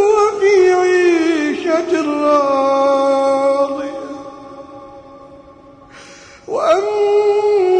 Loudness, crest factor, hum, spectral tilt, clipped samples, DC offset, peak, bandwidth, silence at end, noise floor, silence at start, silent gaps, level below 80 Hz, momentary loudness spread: -14 LUFS; 12 dB; none; -4 dB/octave; under 0.1%; under 0.1%; -4 dBFS; 9.2 kHz; 0 s; -41 dBFS; 0 s; none; -56 dBFS; 18 LU